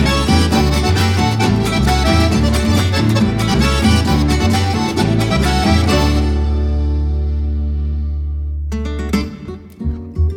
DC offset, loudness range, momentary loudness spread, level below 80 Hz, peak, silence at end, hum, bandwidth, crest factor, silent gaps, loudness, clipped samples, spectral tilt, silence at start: under 0.1%; 6 LU; 9 LU; -20 dBFS; -2 dBFS; 0 s; none; 16.5 kHz; 12 dB; none; -15 LUFS; under 0.1%; -5.5 dB/octave; 0 s